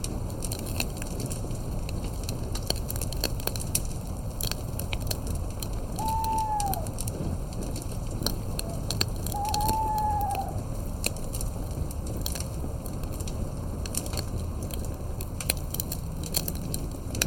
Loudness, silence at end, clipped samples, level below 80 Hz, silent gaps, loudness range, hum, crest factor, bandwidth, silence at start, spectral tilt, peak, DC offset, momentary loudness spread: -31 LUFS; 0 s; under 0.1%; -34 dBFS; none; 4 LU; none; 28 dB; 17 kHz; 0 s; -4 dB/octave; -2 dBFS; under 0.1%; 7 LU